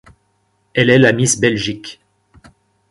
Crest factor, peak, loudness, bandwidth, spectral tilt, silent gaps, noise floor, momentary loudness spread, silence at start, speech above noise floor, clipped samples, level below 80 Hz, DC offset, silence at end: 18 dB; 0 dBFS; -14 LUFS; 11.5 kHz; -4 dB/octave; none; -63 dBFS; 17 LU; 0.75 s; 49 dB; under 0.1%; -50 dBFS; under 0.1%; 0.95 s